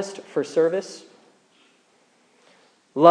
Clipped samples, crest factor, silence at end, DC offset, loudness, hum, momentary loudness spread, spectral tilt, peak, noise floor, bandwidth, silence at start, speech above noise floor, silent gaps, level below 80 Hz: under 0.1%; 24 dB; 0 s; under 0.1%; -23 LUFS; none; 20 LU; -5.5 dB/octave; 0 dBFS; -61 dBFS; 10.5 kHz; 0 s; 36 dB; none; under -90 dBFS